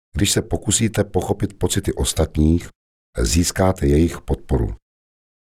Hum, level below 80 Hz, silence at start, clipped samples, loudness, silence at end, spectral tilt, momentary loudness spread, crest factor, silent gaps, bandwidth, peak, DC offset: none; -30 dBFS; 0.15 s; under 0.1%; -20 LUFS; 0.8 s; -5 dB/octave; 7 LU; 16 dB; 2.75-3.13 s; 16 kHz; -4 dBFS; 0.4%